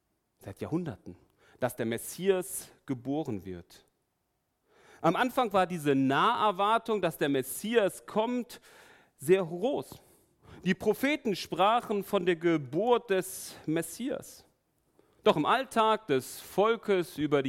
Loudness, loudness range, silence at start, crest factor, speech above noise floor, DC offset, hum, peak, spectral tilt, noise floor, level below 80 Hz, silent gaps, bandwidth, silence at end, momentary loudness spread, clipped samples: -30 LUFS; 7 LU; 0.45 s; 22 dB; 49 dB; under 0.1%; none; -8 dBFS; -5 dB/octave; -79 dBFS; -68 dBFS; none; 16.5 kHz; 0 s; 13 LU; under 0.1%